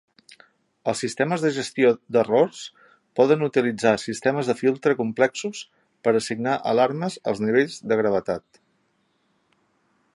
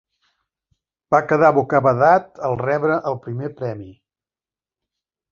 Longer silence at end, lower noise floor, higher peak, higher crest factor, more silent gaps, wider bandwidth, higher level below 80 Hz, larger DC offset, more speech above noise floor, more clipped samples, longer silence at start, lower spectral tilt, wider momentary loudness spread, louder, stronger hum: first, 1.75 s vs 1.4 s; second, -68 dBFS vs under -90 dBFS; about the same, -4 dBFS vs -2 dBFS; about the same, 20 dB vs 18 dB; neither; first, 11.5 kHz vs 7.2 kHz; second, -66 dBFS vs -58 dBFS; neither; second, 46 dB vs over 72 dB; neither; second, 0.85 s vs 1.1 s; second, -5 dB/octave vs -8.5 dB/octave; second, 11 LU vs 14 LU; second, -23 LUFS vs -18 LUFS; neither